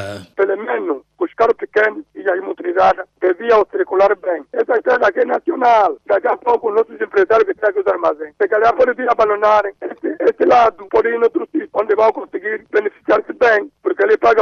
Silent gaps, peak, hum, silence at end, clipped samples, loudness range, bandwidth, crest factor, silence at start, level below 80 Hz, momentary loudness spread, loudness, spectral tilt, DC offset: none; -4 dBFS; none; 0 s; under 0.1%; 2 LU; 6.8 kHz; 10 dB; 0 s; -54 dBFS; 8 LU; -16 LUFS; -5.5 dB/octave; under 0.1%